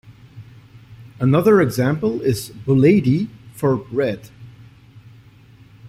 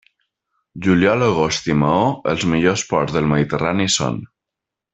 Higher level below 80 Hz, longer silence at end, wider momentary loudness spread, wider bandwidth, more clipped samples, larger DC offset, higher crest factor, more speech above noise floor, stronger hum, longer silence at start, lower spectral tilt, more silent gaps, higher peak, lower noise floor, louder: about the same, -50 dBFS vs -48 dBFS; second, 0 s vs 0.7 s; first, 10 LU vs 4 LU; first, 15.5 kHz vs 8.4 kHz; neither; neither; about the same, 18 dB vs 16 dB; second, 30 dB vs 67 dB; neither; second, 0.1 s vs 0.75 s; first, -7.5 dB/octave vs -5 dB/octave; neither; about the same, -2 dBFS vs -2 dBFS; second, -47 dBFS vs -84 dBFS; about the same, -18 LUFS vs -18 LUFS